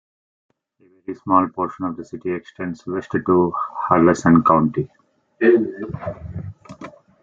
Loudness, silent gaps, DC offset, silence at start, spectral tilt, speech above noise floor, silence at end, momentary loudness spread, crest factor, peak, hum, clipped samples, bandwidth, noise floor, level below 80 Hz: -19 LUFS; none; under 0.1%; 1.1 s; -8 dB/octave; 21 dB; 0.35 s; 20 LU; 18 dB; -2 dBFS; none; under 0.1%; 7.6 kHz; -40 dBFS; -54 dBFS